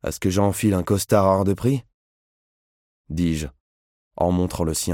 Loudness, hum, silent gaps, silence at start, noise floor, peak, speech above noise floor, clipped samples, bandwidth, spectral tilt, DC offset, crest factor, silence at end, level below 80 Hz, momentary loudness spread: -22 LUFS; none; 1.94-3.04 s, 3.60-4.11 s; 0.05 s; under -90 dBFS; -4 dBFS; over 69 dB; under 0.1%; 17 kHz; -6 dB/octave; under 0.1%; 18 dB; 0 s; -42 dBFS; 9 LU